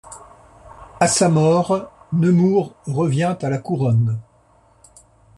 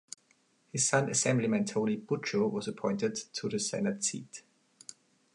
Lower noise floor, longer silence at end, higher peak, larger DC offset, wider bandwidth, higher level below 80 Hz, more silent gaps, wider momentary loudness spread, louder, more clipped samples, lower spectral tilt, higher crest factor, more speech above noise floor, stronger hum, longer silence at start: second, -55 dBFS vs -70 dBFS; first, 1.15 s vs 0.4 s; first, -2 dBFS vs -14 dBFS; neither; about the same, 12 kHz vs 11.5 kHz; first, -54 dBFS vs -76 dBFS; neither; second, 10 LU vs 21 LU; first, -19 LUFS vs -31 LUFS; neither; first, -6 dB/octave vs -4 dB/octave; about the same, 18 dB vs 20 dB; about the same, 37 dB vs 38 dB; neither; second, 0.05 s vs 0.75 s